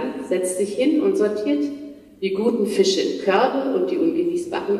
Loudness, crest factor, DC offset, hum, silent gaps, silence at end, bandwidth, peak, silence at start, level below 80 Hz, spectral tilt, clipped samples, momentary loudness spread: -21 LUFS; 16 dB; under 0.1%; none; none; 0 s; 13 kHz; -6 dBFS; 0 s; -64 dBFS; -4.5 dB/octave; under 0.1%; 7 LU